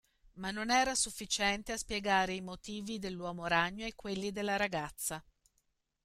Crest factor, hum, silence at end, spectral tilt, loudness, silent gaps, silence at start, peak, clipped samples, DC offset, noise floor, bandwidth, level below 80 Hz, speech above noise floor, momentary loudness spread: 20 dB; none; 0.85 s; -2.5 dB/octave; -34 LUFS; none; 0.35 s; -16 dBFS; under 0.1%; under 0.1%; -79 dBFS; 16 kHz; -58 dBFS; 44 dB; 11 LU